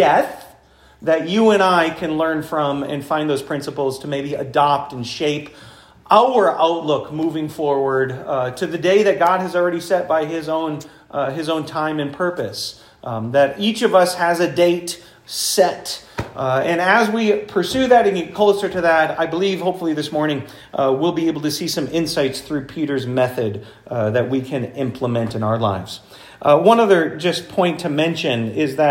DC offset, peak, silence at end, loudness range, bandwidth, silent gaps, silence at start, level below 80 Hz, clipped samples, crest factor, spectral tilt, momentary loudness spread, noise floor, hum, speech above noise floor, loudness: under 0.1%; 0 dBFS; 0 s; 4 LU; 16.5 kHz; none; 0 s; -56 dBFS; under 0.1%; 18 dB; -5 dB/octave; 12 LU; -50 dBFS; none; 32 dB; -19 LUFS